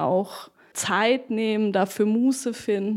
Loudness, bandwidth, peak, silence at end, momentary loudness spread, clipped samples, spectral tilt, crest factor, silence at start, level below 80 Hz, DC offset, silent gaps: -23 LUFS; 16 kHz; -8 dBFS; 0 s; 11 LU; under 0.1%; -4.5 dB/octave; 16 dB; 0 s; -72 dBFS; under 0.1%; none